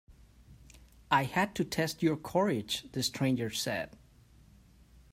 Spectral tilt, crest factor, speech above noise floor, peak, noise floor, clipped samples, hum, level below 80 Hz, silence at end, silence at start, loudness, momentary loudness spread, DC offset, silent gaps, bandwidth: -4.5 dB/octave; 20 dB; 28 dB; -14 dBFS; -59 dBFS; under 0.1%; none; -60 dBFS; 1.25 s; 0.1 s; -32 LUFS; 6 LU; under 0.1%; none; 16 kHz